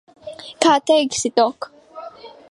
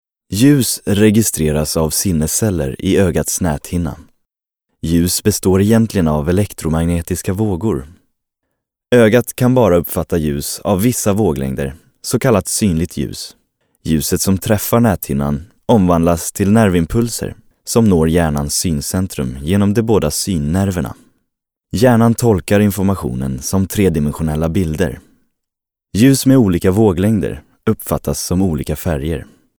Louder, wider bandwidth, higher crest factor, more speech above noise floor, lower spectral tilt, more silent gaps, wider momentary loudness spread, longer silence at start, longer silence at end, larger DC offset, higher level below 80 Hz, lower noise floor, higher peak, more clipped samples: about the same, -17 LUFS vs -15 LUFS; second, 11.5 kHz vs over 20 kHz; about the same, 18 dB vs 14 dB; second, 21 dB vs 66 dB; second, -2 dB/octave vs -5.5 dB/octave; neither; first, 22 LU vs 10 LU; about the same, 0.25 s vs 0.3 s; second, 0.2 s vs 0.35 s; neither; second, -62 dBFS vs -34 dBFS; second, -39 dBFS vs -81 dBFS; about the same, -2 dBFS vs -2 dBFS; neither